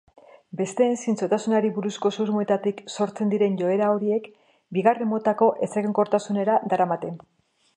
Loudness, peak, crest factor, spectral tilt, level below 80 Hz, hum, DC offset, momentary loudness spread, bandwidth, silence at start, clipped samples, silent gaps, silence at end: -24 LUFS; -6 dBFS; 18 dB; -6.5 dB/octave; -74 dBFS; none; under 0.1%; 8 LU; 10.5 kHz; 0.55 s; under 0.1%; none; 0.6 s